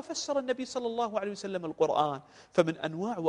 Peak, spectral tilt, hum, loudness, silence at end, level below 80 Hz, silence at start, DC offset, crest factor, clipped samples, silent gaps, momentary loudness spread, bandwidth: -10 dBFS; -4.5 dB/octave; none; -31 LUFS; 0 s; -72 dBFS; 0 s; under 0.1%; 22 dB; under 0.1%; none; 8 LU; 10.5 kHz